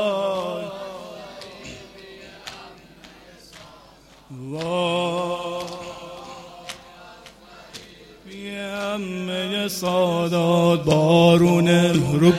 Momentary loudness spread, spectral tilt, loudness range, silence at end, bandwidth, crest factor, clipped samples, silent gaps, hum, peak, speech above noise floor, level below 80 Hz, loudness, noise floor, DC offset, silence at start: 25 LU; -6 dB/octave; 20 LU; 0 s; 15 kHz; 20 dB; under 0.1%; none; none; -2 dBFS; 33 dB; -54 dBFS; -20 LUFS; -49 dBFS; under 0.1%; 0 s